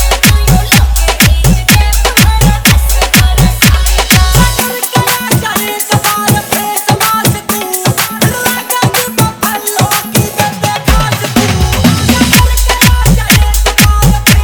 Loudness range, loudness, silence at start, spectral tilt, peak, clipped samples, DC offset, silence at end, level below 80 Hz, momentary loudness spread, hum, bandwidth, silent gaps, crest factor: 3 LU; -9 LUFS; 0 s; -3.5 dB/octave; 0 dBFS; 1%; under 0.1%; 0 s; -14 dBFS; 5 LU; none; over 20 kHz; none; 8 dB